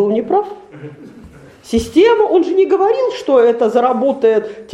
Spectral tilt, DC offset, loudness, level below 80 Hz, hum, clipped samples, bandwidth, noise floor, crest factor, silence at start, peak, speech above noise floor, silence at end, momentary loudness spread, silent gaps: -5.5 dB/octave; under 0.1%; -13 LUFS; -44 dBFS; none; under 0.1%; 12.5 kHz; -39 dBFS; 14 dB; 0 s; 0 dBFS; 25 dB; 0 s; 18 LU; none